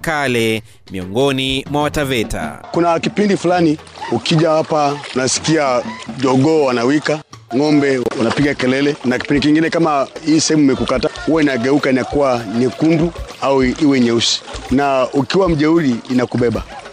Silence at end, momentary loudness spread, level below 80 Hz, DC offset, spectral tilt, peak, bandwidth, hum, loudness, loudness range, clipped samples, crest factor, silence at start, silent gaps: 0 s; 7 LU; -38 dBFS; under 0.1%; -5 dB/octave; -4 dBFS; 15.5 kHz; none; -15 LUFS; 2 LU; under 0.1%; 10 dB; 0 s; none